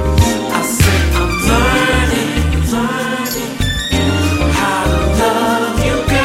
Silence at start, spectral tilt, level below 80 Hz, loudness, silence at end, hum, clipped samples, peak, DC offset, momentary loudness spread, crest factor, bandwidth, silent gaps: 0 s; -4.5 dB/octave; -20 dBFS; -14 LUFS; 0 s; none; under 0.1%; 0 dBFS; under 0.1%; 5 LU; 14 dB; 16.5 kHz; none